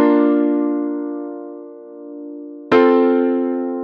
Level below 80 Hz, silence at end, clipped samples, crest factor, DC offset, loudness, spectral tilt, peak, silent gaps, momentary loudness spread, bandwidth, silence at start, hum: -68 dBFS; 0 s; under 0.1%; 16 dB; under 0.1%; -17 LUFS; -7.5 dB/octave; -2 dBFS; none; 21 LU; 5.4 kHz; 0 s; none